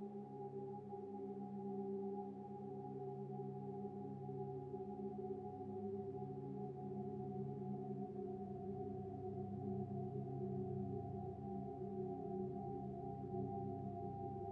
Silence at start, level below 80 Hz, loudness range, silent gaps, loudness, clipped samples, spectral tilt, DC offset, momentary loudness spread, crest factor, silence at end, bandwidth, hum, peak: 0 s; -74 dBFS; 2 LU; none; -48 LUFS; under 0.1%; -11.5 dB/octave; under 0.1%; 4 LU; 14 dB; 0 s; 4.1 kHz; 50 Hz at -60 dBFS; -32 dBFS